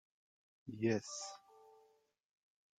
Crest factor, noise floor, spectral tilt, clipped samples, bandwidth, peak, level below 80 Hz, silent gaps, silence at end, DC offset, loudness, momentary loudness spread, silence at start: 22 dB; -72 dBFS; -5 dB/octave; under 0.1%; 9.4 kHz; -22 dBFS; -82 dBFS; none; 1.05 s; under 0.1%; -40 LUFS; 19 LU; 0.65 s